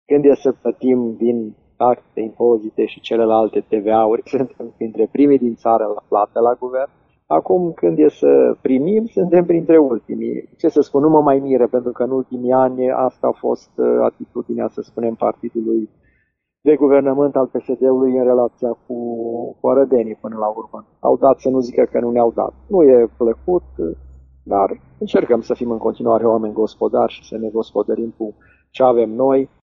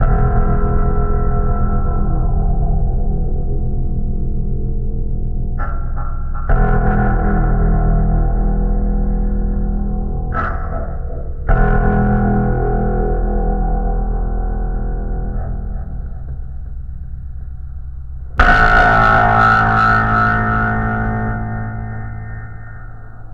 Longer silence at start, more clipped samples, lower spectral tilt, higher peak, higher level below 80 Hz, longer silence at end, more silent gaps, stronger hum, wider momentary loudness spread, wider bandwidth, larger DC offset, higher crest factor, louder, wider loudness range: about the same, 0.1 s vs 0 s; neither; second, -7 dB/octave vs -8.5 dB/octave; about the same, 0 dBFS vs 0 dBFS; second, -52 dBFS vs -18 dBFS; first, 0.15 s vs 0 s; neither; neither; second, 11 LU vs 19 LU; first, 6.4 kHz vs 5.4 kHz; second, under 0.1% vs 1%; about the same, 16 dB vs 14 dB; about the same, -17 LUFS vs -18 LUFS; second, 4 LU vs 11 LU